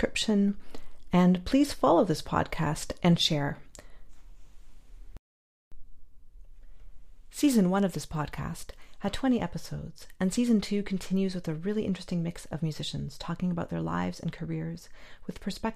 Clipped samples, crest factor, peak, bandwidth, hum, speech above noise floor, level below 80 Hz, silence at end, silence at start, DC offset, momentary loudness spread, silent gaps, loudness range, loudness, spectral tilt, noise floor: under 0.1%; 20 dB; -10 dBFS; 15.5 kHz; none; over 62 dB; -48 dBFS; 0 s; 0 s; under 0.1%; 15 LU; 5.19-5.71 s; 7 LU; -29 LUFS; -6 dB/octave; under -90 dBFS